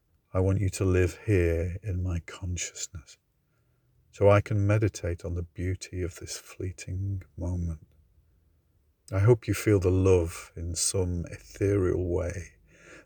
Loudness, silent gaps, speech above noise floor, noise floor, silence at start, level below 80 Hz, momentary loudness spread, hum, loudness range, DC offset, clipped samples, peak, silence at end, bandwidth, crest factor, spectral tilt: -28 LUFS; none; 43 dB; -70 dBFS; 0.35 s; -50 dBFS; 14 LU; none; 9 LU; under 0.1%; under 0.1%; -8 dBFS; 0.05 s; over 20 kHz; 20 dB; -6 dB/octave